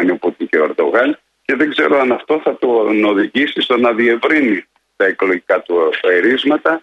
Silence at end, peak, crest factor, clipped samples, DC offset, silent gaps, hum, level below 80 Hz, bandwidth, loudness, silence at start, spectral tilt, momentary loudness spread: 0.05 s; 0 dBFS; 14 dB; under 0.1%; under 0.1%; none; none; -62 dBFS; 8.2 kHz; -14 LUFS; 0 s; -5.5 dB/octave; 5 LU